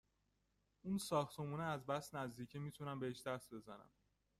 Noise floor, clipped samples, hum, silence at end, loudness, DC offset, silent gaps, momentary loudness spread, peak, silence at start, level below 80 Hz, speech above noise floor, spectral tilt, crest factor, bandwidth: -83 dBFS; under 0.1%; 50 Hz at -65 dBFS; 0.5 s; -45 LUFS; under 0.1%; none; 14 LU; -26 dBFS; 0.85 s; -76 dBFS; 38 dB; -5.5 dB/octave; 22 dB; 15.5 kHz